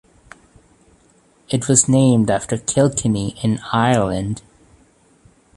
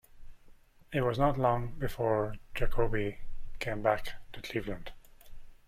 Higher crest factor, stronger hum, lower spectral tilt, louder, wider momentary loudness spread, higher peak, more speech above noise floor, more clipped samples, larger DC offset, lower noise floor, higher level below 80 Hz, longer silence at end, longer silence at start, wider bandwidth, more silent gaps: about the same, 20 dB vs 20 dB; neither; second, -5 dB/octave vs -7 dB/octave; first, -17 LUFS vs -33 LUFS; second, 11 LU vs 16 LU; first, 0 dBFS vs -12 dBFS; first, 38 dB vs 26 dB; neither; neither; about the same, -55 dBFS vs -56 dBFS; about the same, -46 dBFS vs -42 dBFS; first, 1.15 s vs 0.15 s; first, 1.5 s vs 0.15 s; second, 11.5 kHz vs 15 kHz; neither